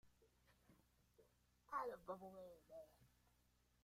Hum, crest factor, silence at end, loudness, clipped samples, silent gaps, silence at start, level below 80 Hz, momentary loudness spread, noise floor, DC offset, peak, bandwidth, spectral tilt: none; 22 dB; 0.55 s; -54 LUFS; under 0.1%; none; 0.05 s; -82 dBFS; 14 LU; -80 dBFS; under 0.1%; -36 dBFS; 15.5 kHz; -5.5 dB/octave